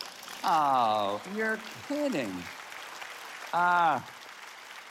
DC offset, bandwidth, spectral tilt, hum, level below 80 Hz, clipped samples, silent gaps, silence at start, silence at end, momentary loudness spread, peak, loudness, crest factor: under 0.1%; 16.5 kHz; -4 dB/octave; none; -78 dBFS; under 0.1%; none; 0 s; 0 s; 19 LU; -14 dBFS; -29 LUFS; 18 dB